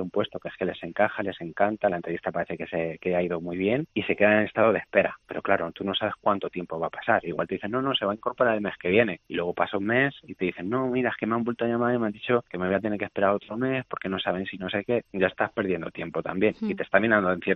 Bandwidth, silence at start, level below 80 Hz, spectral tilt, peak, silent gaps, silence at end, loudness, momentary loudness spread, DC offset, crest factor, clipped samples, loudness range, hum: 5.8 kHz; 0 s; -64 dBFS; -8.5 dB/octave; -6 dBFS; none; 0 s; -26 LUFS; 8 LU; under 0.1%; 22 dB; under 0.1%; 3 LU; none